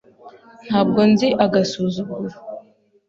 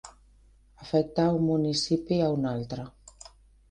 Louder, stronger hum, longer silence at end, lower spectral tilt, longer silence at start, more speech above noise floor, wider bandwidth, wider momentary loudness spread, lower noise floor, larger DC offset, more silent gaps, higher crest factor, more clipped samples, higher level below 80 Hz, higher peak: first, -18 LUFS vs -27 LUFS; neither; second, 0.5 s vs 0.8 s; about the same, -6.5 dB/octave vs -6 dB/octave; first, 0.25 s vs 0.05 s; about the same, 32 dB vs 32 dB; second, 7.6 kHz vs 10 kHz; about the same, 20 LU vs 22 LU; second, -50 dBFS vs -58 dBFS; neither; neither; about the same, 20 dB vs 18 dB; neither; about the same, -58 dBFS vs -56 dBFS; first, 0 dBFS vs -12 dBFS